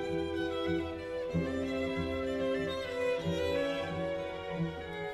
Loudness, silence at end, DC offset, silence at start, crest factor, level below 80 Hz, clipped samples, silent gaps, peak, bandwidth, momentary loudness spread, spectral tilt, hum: -35 LUFS; 0 s; under 0.1%; 0 s; 12 dB; -54 dBFS; under 0.1%; none; -22 dBFS; 14 kHz; 5 LU; -6.5 dB/octave; none